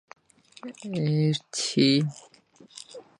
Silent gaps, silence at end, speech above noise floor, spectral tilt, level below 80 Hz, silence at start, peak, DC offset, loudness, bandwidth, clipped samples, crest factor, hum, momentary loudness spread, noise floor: none; 0.2 s; 24 dB; -5 dB/octave; -70 dBFS; 0.65 s; -8 dBFS; under 0.1%; -25 LUFS; 11 kHz; under 0.1%; 20 dB; none; 22 LU; -49 dBFS